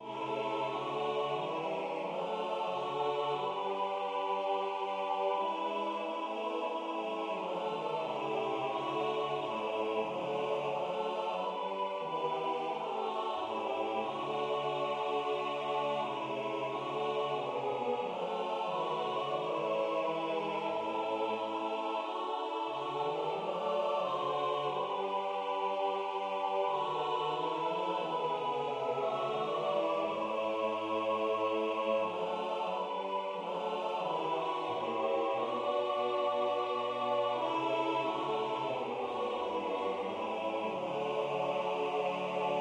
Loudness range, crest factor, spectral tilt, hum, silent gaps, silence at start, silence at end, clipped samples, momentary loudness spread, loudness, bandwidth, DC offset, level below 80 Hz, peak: 2 LU; 14 dB; -5 dB/octave; none; none; 0 s; 0 s; under 0.1%; 4 LU; -35 LUFS; 10.5 kHz; under 0.1%; -82 dBFS; -20 dBFS